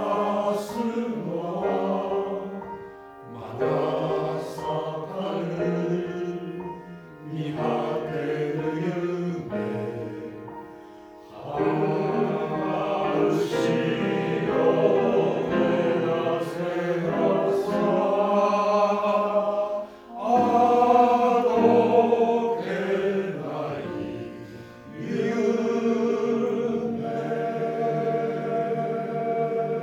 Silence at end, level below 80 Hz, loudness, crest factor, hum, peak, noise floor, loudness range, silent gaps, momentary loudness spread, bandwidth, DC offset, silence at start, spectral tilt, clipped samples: 0 s; -62 dBFS; -25 LUFS; 18 dB; none; -6 dBFS; -45 dBFS; 8 LU; none; 16 LU; 14 kHz; under 0.1%; 0 s; -7 dB/octave; under 0.1%